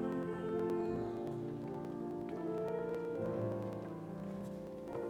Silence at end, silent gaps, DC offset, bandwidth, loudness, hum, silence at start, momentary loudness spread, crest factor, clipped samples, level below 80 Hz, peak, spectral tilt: 0 s; none; under 0.1%; 14.5 kHz; -41 LUFS; none; 0 s; 8 LU; 14 dB; under 0.1%; -66 dBFS; -26 dBFS; -8.5 dB/octave